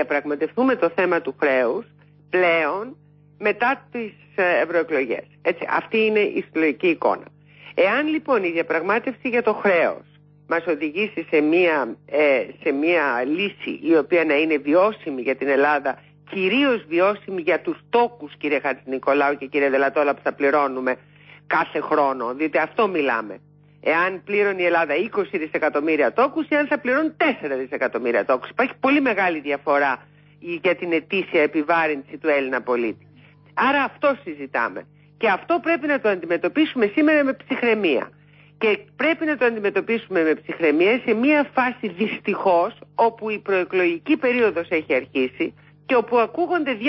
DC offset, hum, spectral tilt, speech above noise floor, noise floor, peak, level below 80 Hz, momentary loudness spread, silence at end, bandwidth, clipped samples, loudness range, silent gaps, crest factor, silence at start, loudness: under 0.1%; 50 Hz at -50 dBFS; -9.5 dB/octave; 29 dB; -50 dBFS; -6 dBFS; -70 dBFS; 7 LU; 0 s; 5.8 kHz; under 0.1%; 2 LU; none; 14 dB; 0 s; -21 LUFS